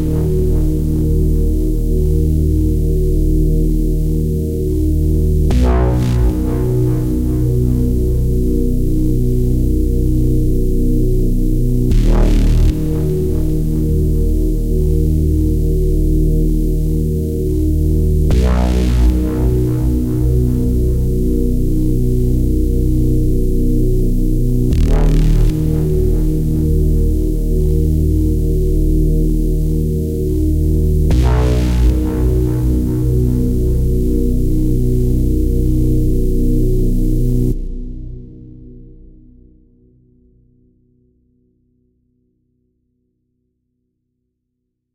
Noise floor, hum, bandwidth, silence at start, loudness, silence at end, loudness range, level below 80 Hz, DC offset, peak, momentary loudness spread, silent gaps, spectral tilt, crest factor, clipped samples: -73 dBFS; none; 16 kHz; 0 s; -16 LUFS; 6.05 s; 1 LU; -16 dBFS; under 0.1%; -2 dBFS; 3 LU; none; -8.5 dB/octave; 12 dB; under 0.1%